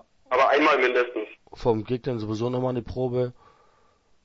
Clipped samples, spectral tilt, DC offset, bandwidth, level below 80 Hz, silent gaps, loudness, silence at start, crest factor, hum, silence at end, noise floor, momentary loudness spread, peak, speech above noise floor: under 0.1%; -6.5 dB/octave; under 0.1%; 7.6 kHz; -52 dBFS; none; -24 LUFS; 0.3 s; 18 dB; none; 0.95 s; -61 dBFS; 11 LU; -8 dBFS; 37 dB